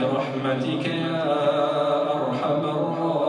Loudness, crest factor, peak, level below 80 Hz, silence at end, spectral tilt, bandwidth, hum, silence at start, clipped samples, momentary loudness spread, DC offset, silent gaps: -24 LUFS; 12 dB; -10 dBFS; -76 dBFS; 0 s; -7 dB/octave; 10 kHz; none; 0 s; under 0.1%; 3 LU; under 0.1%; none